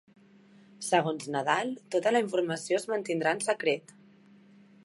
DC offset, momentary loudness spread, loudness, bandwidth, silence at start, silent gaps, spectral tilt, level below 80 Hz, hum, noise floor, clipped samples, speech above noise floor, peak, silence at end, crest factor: under 0.1%; 5 LU; -29 LUFS; 11.5 kHz; 0.8 s; none; -4 dB/octave; -82 dBFS; none; -57 dBFS; under 0.1%; 29 dB; -8 dBFS; 1.05 s; 22 dB